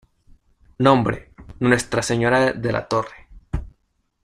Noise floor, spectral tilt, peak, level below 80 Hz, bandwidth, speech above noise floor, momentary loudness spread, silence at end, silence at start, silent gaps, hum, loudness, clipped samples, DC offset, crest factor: -69 dBFS; -5.5 dB/octave; -2 dBFS; -40 dBFS; 15 kHz; 50 dB; 15 LU; 0.55 s; 0.8 s; none; none; -20 LUFS; under 0.1%; under 0.1%; 20 dB